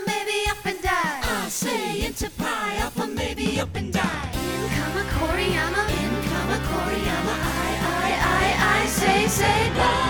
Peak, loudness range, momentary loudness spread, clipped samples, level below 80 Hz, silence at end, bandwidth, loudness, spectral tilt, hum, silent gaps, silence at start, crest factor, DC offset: -6 dBFS; 5 LU; 7 LU; under 0.1%; -36 dBFS; 0 s; over 20 kHz; -23 LUFS; -4 dB/octave; none; none; 0 s; 18 dB; under 0.1%